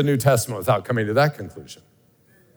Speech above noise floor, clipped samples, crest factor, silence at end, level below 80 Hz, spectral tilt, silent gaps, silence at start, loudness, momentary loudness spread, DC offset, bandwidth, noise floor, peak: 36 dB; under 0.1%; 20 dB; 0.8 s; -62 dBFS; -5.5 dB/octave; none; 0 s; -21 LUFS; 19 LU; under 0.1%; over 20 kHz; -57 dBFS; -4 dBFS